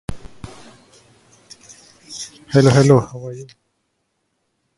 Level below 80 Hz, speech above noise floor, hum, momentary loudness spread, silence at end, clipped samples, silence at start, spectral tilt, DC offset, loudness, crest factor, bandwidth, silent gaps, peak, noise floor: -46 dBFS; 56 dB; none; 27 LU; 1.35 s; under 0.1%; 0.1 s; -6.5 dB/octave; under 0.1%; -14 LUFS; 20 dB; 11.5 kHz; none; 0 dBFS; -71 dBFS